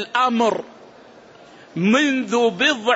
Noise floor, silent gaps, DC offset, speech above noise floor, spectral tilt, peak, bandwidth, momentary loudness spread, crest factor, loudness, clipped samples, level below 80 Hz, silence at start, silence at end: -45 dBFS; none; under 0.1%; 27 dB; -4 dB/octave; -4 dBFS; 8 kHz; 13 LU; 16 dB; -19 LUFS; under 0.1%; -68 dBFS; 0 s; 0 s